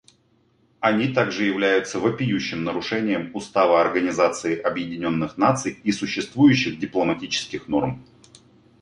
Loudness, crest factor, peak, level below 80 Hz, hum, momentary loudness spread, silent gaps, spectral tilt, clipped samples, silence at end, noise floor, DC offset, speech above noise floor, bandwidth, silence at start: -22 LUFS; 18 dB; -4 dBFS; -56 dBFS; none; 8 LU; none; -5 dB/octave; under 0.1%; 0.8 s; -62 dBFS; under 0.1%; 40 dB; 11 kHz; 0.8 s